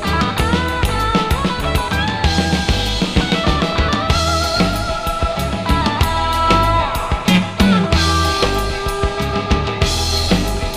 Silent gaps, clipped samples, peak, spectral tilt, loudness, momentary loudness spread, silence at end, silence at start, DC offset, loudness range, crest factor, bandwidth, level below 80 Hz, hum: none; under 0.1%; 0 dBFS; -5 dB/octave; -16 LUFS; 6 LU; 0 s; 0 s; under 0.1%; 2 LU; 16 dB; 15.5 kHz; -22 dBFS; none